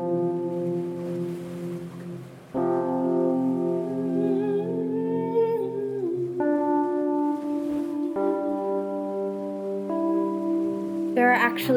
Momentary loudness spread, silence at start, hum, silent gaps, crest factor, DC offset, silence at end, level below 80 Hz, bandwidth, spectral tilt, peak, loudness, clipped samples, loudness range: 8 LU; 0 s; none; none; 18 dB; under 0.1%; 0 s; -68 dBFS; 19.5 kHz; -7.5 dB/octave; -6 dBFS; -26 LUFS; under 0.1%; 2 LU